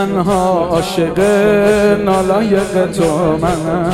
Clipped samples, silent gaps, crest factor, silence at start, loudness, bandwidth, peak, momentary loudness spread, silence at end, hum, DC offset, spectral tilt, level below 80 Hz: under 0.1%; none; 12 dB; 0 s; -13 LUFS; 15 kHz; 0 dBFS; 5 LU; 0 s; none; under 0.1%; -6 dB/octave; -36 dBFS